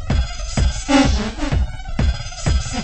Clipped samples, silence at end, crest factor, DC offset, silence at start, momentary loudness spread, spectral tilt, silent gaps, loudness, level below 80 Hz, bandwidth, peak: under 0.1%; 0 s; 16 dB; under 0.1%; 0 s; 8 LU; -5 dB/octave; none; -20 LUFS; -22 dBFS; 8.8 kHz; -2 dBFS